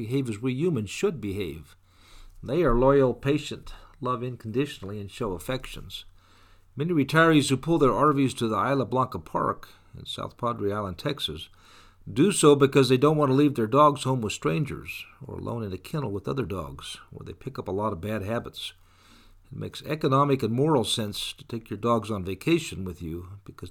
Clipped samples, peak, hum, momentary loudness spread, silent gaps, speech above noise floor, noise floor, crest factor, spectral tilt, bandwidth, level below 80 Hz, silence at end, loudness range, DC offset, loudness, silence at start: under 0.1%; -6 dBFS; none; 18 LU; none; 30 dB; -55 dBFS; 20 dB; -5.5 dB/octave; 17.5 kHz; -46 dBFS; 0 s; 11 LU; under 0.1%; -25 LUFS; 0 s